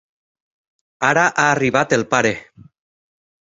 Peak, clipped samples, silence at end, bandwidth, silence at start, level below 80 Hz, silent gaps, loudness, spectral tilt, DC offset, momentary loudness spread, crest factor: -2 dBFS; under 0.1%; 1.05 s; 8 kHz; 1 s; -56 dBFS; none; -17 LUFS; -4 dB/octave; under 0.1%; 6 LU; 18 dB